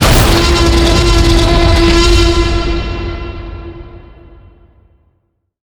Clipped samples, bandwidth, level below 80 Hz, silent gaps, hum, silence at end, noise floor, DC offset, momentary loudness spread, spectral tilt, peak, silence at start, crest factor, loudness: 0.3%; over 20 kHz; -14 dBFS; none; none; 1.65 s; -62 dBFS; under 0.1%; 18 LU; -5 dB/octave; 0 dBFS; 0 s; 12 dB; -10 LUFS